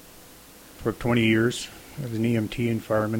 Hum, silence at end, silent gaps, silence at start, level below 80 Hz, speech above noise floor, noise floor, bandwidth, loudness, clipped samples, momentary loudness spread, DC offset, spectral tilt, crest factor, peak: none; 0 s; none; 0.05 s; -50 dBFS; 24 dB; -48 dBFS; 17 kHz; -25 LUFS; under 0.1%; 12 LU; under 0.1%; -6 dB/octave; 16 dB; -10 dBFS